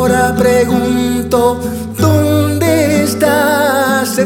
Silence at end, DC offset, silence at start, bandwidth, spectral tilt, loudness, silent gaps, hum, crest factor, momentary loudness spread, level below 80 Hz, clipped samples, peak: 0 s; under 0.1%; 0 s; 19 kHz; -5.5 dB/octave; -12 LUFS; none; none; 12 dB; 4 LU; -36 dBFS; under 0.1%; 0 dBFS